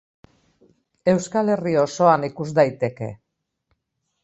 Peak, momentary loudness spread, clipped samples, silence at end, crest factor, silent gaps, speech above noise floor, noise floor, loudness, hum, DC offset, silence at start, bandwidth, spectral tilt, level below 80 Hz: -2 dBFS; 9 LU; under 0.1%; 1.1 s; 20 dB; none; 55 dB; -75 dBFS; -20 LUFS; none; under 0.1%; 1.05 s; 8.2 kHz; -6.5 dB/octave; -62 dBFS